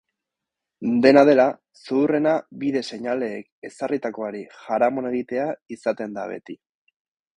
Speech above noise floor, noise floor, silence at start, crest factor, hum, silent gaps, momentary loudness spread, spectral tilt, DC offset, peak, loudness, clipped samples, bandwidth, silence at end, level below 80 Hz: 63 dB; -85 dBFS; 0.8 s; 22 dB; none; 3.52-3.62 s, 5.62-5.66 s; 20 LU; -6.5 dB/octave; under 0.1%; 0 dBFS; -22 LUFS; under 0.1%; 10.5 kHz; 0.8 s; -66 dBFS